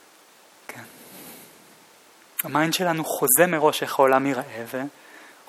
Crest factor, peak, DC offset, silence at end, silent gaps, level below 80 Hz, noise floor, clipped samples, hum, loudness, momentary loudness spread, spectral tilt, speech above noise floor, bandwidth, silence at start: 22 dB; -2 dBFS; under 0.1%; 0.25 s; none; -74 dBFS; -53 dBFS; under 0.1%; none; -22 LUFS; 24 LU; -3 dB/octave; 31 dB; 16.5 kHz; 0.7 s